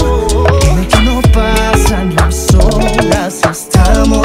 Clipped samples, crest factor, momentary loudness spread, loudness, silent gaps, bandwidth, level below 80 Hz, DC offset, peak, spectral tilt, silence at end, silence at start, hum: 1%; 8 dB; 3 LU; -10 LUFS; none; 16 kHz; -12 dBFS; under 0.1%; 0 dBFS; -5 dB/octave; 0 s; 0 s; none